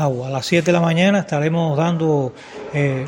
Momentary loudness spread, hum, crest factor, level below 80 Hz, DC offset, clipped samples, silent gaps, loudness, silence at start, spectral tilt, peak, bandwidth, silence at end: 9 LU; none; 16 dB; -56 dBFS; under 0.1%; under 0.1%; none; -18 LUFS; 0 s; -6.5 dB/octave; -2 dBFS; 16.5 kHz; 0 s